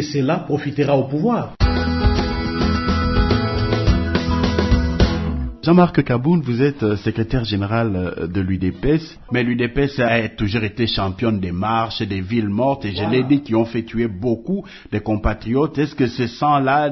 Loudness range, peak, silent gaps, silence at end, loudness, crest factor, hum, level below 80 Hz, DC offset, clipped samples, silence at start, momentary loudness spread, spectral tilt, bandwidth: 3 LU; -2 dBFS; none; 0 s; -19 LUFS; 16 dB; none; -28 dBFS; under 0.1%; under 0.1%; 0 s; 6 LU; -7.5 dB/octave; 6.2 kHz